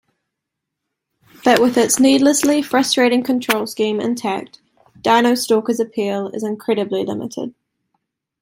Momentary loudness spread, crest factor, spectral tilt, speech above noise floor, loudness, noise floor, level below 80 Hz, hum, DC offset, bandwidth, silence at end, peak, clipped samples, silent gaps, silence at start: 11 LU; 18 dB; -3 dB/octave; 63 dB; -17 LUFS; -80 dBFS; -62 dBFS; none; under 0.1%; 16.5 kHz; 0.9 s; 0 dBFS; under 0.1%; none; 1.45 s